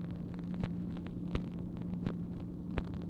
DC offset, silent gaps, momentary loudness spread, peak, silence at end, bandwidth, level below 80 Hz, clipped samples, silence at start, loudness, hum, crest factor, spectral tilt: under 0.1%; none; 3 LU; -18 dBFS; 0 s; 6 kHz; -50 dBFS; under 0.1%; 0 s; -40 LUFS; none; 20 dB; -9 dB/octave